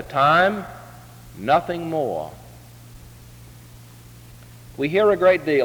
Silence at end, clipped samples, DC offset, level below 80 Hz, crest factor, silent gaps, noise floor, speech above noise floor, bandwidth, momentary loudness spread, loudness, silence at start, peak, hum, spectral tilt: 0 s; under 0.1%; under 0.1%; -52 dBFS; 18 dB; none; -44 dBFS; 25 dB; over 20 kHz; 25 LU; -20 LUFS; 0 s; -6 dBFS; none; -6 dB/octave